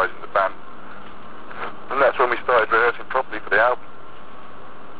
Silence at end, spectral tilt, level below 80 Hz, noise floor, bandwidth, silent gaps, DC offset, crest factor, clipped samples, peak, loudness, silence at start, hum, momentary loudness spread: 0 s; -7 dB/octave; -56 dBFS; -42 dBFS; 4 kHz; none; 4%; 18 dB; under 0.1%; -6 dBFS; -20 LUFS; 0 s; none; 24 LU